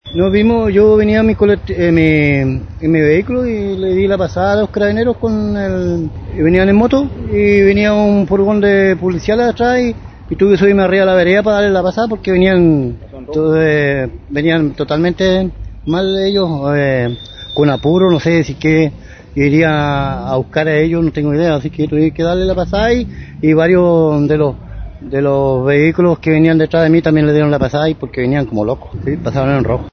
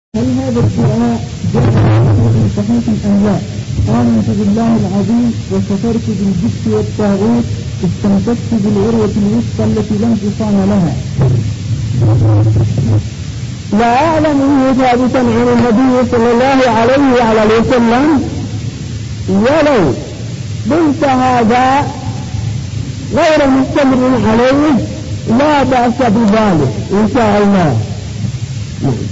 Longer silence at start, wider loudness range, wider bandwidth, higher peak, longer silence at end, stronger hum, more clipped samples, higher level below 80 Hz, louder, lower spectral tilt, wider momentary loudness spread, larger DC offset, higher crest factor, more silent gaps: about the same, 0.05 s vs 0.15 s; about the same, 3 LU vs 3 LU; second, 6.6 kHz vs 8 kHz; first, 0 dBFS vs -4 dBFS; about the same, 0.05 s vs 0 s; neither; neither; about the same, -32 dBFS vs -30 dBFS; about the same, -13 LUFS vs -12 LUFS; about the same, -8 dB/octave vs -7 dB/octave; about the same, 8 LU vs 10 LU; neither; about the same, 12 dB vs 8 dB; neither